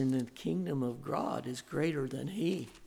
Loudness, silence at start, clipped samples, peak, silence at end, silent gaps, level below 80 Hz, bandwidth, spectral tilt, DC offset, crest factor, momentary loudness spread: -36 LUFS; 0 s; under 0.1%; -20 dBFS; 0 s; none; -68 dBFS; 16.5 kHz; -6.5 dB/octave; under 0.1%; 14 dB; 4 LU